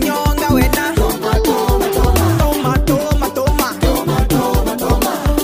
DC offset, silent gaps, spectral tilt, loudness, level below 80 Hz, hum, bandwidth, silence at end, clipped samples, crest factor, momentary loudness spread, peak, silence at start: under 0.1%; none; -5.5 dB/octave; -15 LUFS; -20 dBFS; none; 16 kHz; 0 s; under 0.1%; 14 dB; 3 LU; 0 dBFS; 0 s